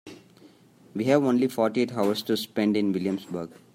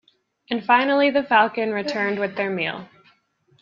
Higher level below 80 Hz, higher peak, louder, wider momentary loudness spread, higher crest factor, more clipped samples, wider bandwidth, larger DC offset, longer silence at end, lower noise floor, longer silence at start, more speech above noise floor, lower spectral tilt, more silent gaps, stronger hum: about the same, -72 dBFS vs -70 dBFS; second, -8 dBFS vs -2 dBFS; second, -25 LUFS vs -21 LUFS; about the same, 11 LU vs 10 LU; about the same, 18 dB vs 20 dB; neither; first, 16 kHz vs 7.4 kHz; neither; second, 0.3 s vs 0.75 s; second, -54 dBFS vs -62 dBFS; second, 0.05 s vs 0.5 s; second, 29 dB vs 41 dB; about the same, -6 dB/octave vs -5.5 dB/octave; neither; neither